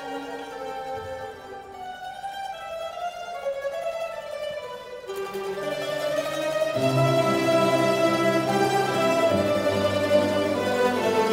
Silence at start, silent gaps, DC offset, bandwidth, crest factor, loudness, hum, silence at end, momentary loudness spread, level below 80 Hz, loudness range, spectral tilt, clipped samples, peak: 0 s; none; under 0.1%; 16 kHz; 18 dB; -25 LUFS; none; 0 s; 14 LU; -60 dBFS; 12 LU; -5 dB/octave; under 0.1%; -8 dBFS